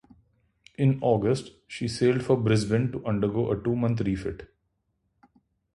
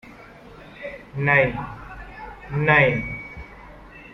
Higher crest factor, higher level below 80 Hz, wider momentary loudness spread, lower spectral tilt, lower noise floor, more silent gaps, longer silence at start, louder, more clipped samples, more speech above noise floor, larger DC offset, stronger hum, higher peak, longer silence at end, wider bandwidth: about the same, 18 dB vs 22 dB; second, -52 dBFS vs -44 dBFS; second, 11 LU vs 25 LU; about the same, -7 dB/octave vs -8 dB/octave; first, -75 dBFS vs -44 dBFS; neither; first, 0.8 s vs 0.05 s; second, -26 LUFS vs -20 LUFS; neither; first, 50 dB vs 24 dB; neither; neither; second, -8 dBFS vs -4 dBFS; first, 1.3 s vs 0 s; first, 11.5 kHz vs 6.2 kHz